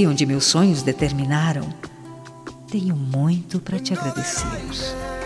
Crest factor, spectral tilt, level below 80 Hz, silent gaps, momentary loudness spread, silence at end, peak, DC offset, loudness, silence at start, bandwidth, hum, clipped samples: 16 dB; -5 dB/octave; -42 dBFS; none; 21 LU; 0 s; -4 dBFS; under 0.1%; -21 LUFS; 0 s; 13 kHz; none; under 0.1%